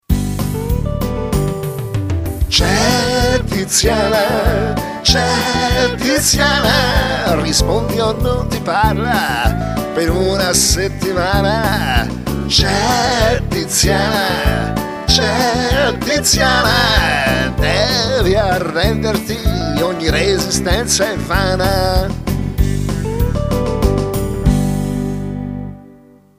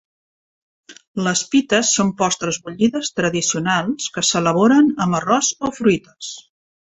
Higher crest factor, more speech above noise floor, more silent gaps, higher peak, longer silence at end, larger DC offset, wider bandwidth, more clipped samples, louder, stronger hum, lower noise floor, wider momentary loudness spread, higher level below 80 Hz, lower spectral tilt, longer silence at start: about the same, 14 dB vs 18 dB; second, 29 dB vs over 72 dB; second, none vs 1.08-1.14 s; about the same, 0 dBFS vs -2 dBFS; about the same, 0.45 s vs 0.45 s; neither; first, 16 kHz vs 8.4 kHz; neither; first, -15 LUFS vs -18 LUFS; neither; second, -43 dBFS vs under -90 dBFS; about the same, 8 LU vs 9 LU; first, -24 dBFS vs -56 dBFS; about the same, -4 dB/octave vs -3.5 dB/octave; second, 0.1 s vs 0.9 s